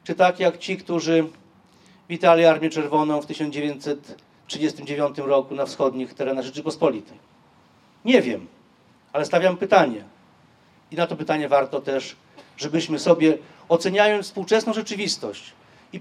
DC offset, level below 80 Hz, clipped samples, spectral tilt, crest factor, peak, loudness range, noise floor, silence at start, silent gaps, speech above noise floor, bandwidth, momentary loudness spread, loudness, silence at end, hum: under 0.1%; -74 dBFS; under 0.1%; -5 dB/octave; 22 dB; 0 dBFS; 4 LU; -56 dBFS; 0.05 s; none; 35 dB; 12.5 kHz; 13 LU; -22 LUFS; 0 s; none